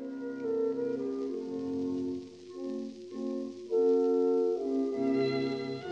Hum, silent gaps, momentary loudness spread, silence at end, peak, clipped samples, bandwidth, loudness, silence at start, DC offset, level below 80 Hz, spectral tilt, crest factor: none; none; 12 LU; 0 s; -18 dBFS; under 0.1%; 7.8 kHz; -32 LUFS; 0 s; under 0.1%; -78 dBFS; -7 dB/octave; 14 dB